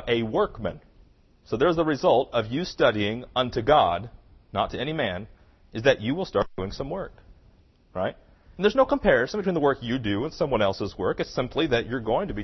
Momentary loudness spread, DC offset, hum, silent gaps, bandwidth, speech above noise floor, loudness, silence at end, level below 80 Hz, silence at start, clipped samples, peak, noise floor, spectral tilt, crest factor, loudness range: 12 LU; under 0.1%; none; none; 6.2 kHz; 32 dB; -25 LUFS; 0 s; -46 dBFS; 0 s; under 0.1%; -6 dBFS; -57 dBFS; -6 dB/octave; 20 dB; 5 LU